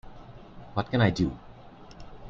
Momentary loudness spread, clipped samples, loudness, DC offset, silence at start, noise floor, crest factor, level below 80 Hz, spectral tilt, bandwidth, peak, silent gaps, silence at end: 25 LU; under 0.1%; -27 LUFS; under 0.1%; 0.05 s; -48 dBFS; 22 dB; -48 dBFS; -7 dB/octave; 7.4 kHz; -8 dBFS; none; 0 s